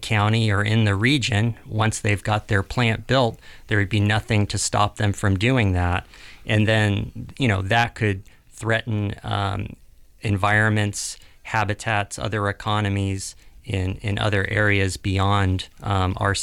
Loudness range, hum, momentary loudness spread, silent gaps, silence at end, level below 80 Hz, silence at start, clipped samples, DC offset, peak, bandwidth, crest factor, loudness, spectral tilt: 3 LU; none; 8 LU; none; 0 s; -44 dBFS; 0 s; under 0.1%; under 0.1%; -6 dBFS; 12.5 kHz; 16 dB; -22 LUFS; -5 dB/octave